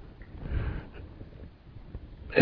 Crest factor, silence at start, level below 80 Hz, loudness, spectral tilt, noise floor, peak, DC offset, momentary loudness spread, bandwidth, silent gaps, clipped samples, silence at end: 28 dB; 0 s; -42 dBFS; -38 LUFS; -9 dB/octave; -48 dBFS; -2 dBFS; under 0.1%; 15 LU; 5.2 kHz; none; under 0.1%; 0 s